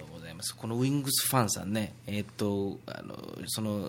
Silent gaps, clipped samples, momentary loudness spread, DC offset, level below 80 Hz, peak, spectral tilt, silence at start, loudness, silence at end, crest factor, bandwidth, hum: none; under 0.1%; 15 LU; under 0.1%; -66 dBFS; -10 dBFS; -4 dB/octave; 0 s; -31 LUFS; 0 s; 22 dB; 17 kHz; none